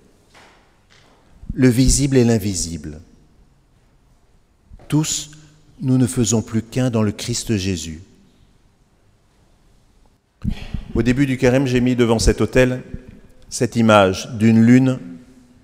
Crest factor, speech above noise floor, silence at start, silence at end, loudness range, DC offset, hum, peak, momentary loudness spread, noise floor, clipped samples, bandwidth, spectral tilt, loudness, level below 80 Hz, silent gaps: 20 dB; 40 dB; 1.45 s; 0.45 s; 11 LU; under 0.1%; none; 0 dBFS; 17 LU; -56 dBFS; under 0.1%; 16 kHz; -5.5 dB/octave; -17 LUFS; -34 dBFS; none